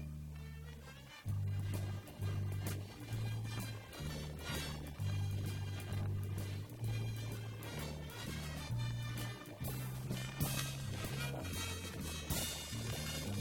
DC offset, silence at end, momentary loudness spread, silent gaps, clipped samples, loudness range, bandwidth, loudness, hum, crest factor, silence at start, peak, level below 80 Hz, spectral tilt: under 0.1%; 0 s; 6 LU; none; under 0.1%; 2 LU; 18 kHz; -42 LUFS; none; 18 dB; 0 s; -24 dBFS; -54 dBFS; -4.5 dB/octave